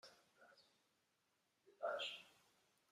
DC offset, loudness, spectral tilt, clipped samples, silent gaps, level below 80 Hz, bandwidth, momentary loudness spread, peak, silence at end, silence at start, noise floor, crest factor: under 0.1%; -48 LUFS; -0.5 dB/octave; under 0.1%; none; under -90 dBFS; 14.5 kHz; 24 LU; -34 dBFS; 0.6 s; 0.05 s; -85 dBFS; 22 dB